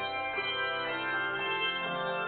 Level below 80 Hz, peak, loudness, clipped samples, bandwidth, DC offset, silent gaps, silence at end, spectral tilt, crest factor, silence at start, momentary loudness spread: -68 dBFS; -20 dBFS; -31 LUFS; under 0.1%; 4.7 kHz; under 0.1%; none; 0 s; 0 dB/octave; 14 dB; 0 s; 2 LU